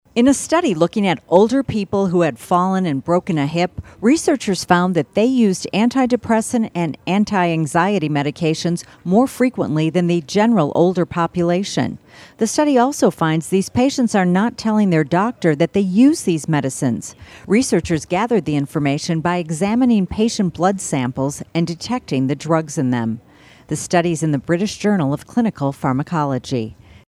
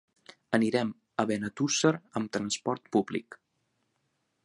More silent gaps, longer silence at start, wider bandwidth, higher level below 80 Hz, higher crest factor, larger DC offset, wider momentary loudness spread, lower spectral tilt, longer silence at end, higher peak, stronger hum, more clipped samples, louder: neither; second, 0.15 s vs 0.5 s; first, 14 kHz vs 11.5 kHz; first, -50 dBFS vs -70 dBFS; about the same, 18 dB vs 22 dB; neither; about the same, 7 LU vs 8 LU; first, -6 dB/octave vs -4 dB/octave; second, 0.35 s vs 1.1 s; first, 0 dBFS vs -10 dBFS; neither; neither; first, -18 LUFS vs -30 LUFS